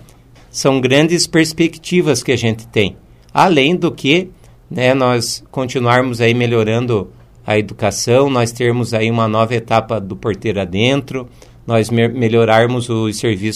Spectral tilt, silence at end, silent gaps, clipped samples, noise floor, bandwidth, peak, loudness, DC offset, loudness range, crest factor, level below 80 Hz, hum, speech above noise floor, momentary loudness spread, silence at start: -5 dB/octave; 0 s; none; under 0.1%; -43 dBFS; 15 kHz; 0 dBFS; -15 LUFS; 0.1%; 2 LU; 14 dB; -46 dBFS; none; 29 dB; 8 LU; 0.55 s